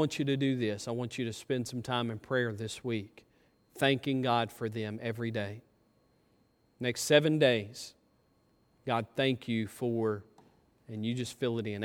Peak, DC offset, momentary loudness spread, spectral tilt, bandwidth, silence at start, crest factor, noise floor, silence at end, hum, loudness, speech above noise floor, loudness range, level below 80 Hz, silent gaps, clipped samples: -10 dBFS; under 0.1%; 12 LU; -5 dB/octave; 18 kHz; 0 s; 24 dB; -70 dBFS; 0 s; none; -32 LUFS; 38 dB; 4 LU; -72 dBFS; none; under 0.1%